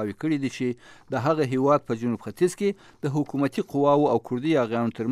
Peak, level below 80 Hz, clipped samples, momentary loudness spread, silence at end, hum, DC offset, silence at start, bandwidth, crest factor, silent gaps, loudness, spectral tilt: -8 dBFS; -66 dBFS; under 0.1%; 8 LU; 0 s; none; under 0.1%; 0 s; 14.5 kHz; 16 dB; none; -25 LUFS; -7 dB/octave